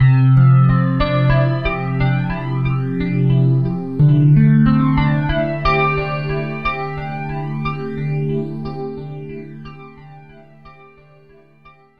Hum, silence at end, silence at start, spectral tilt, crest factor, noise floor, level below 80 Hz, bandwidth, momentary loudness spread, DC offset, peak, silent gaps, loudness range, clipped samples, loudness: none; 0.3 s; 0 s; -10 dB/octave; 14 dB; -48 dBFS; -32 dBFS; 5.2 kHz; 15 LU; 1%; -2 dBFS; none; 12 LU; under 0.1%; -17 LUFS